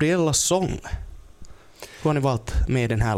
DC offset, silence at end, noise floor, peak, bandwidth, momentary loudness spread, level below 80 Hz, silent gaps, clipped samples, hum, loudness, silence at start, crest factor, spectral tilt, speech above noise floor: under 0.1%; 0 s; -44 dBFS; -10 dBFS; 16.5 kHz; 21 LU; -32 dBFS; none; under 0.1%; none; -23 LUFS; 0 s; 14 dB; -4.5 dB/octave; 22 dB